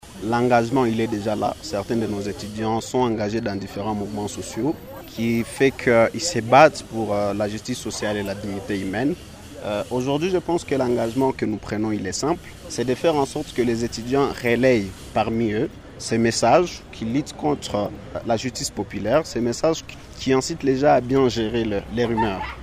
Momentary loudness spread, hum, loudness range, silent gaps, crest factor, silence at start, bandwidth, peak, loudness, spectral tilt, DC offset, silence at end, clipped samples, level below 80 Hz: 10 LU; none; 5 LU; none; 22 dB; 0.05 s; 15.5 kHz; 0 dBFS; -22 LUFS; -5 dB/octave; under 0.1%; 0 s; under 0.1%; -46 dBFS